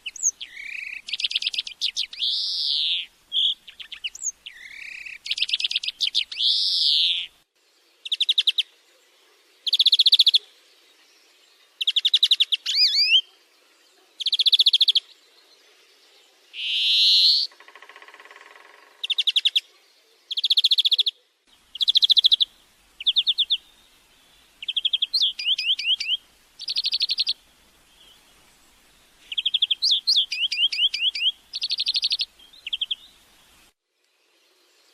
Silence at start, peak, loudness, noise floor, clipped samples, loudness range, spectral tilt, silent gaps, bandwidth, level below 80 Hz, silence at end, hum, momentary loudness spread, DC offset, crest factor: 0.05 s; -6 dBFS; -20 LUFS; -70 dBFS; under 0.1%; 7 LU; 5 dB/octave; none; 15 kHz; -72 dBFS; 2 s; none; 17 LU; under 0.1%; 20 dB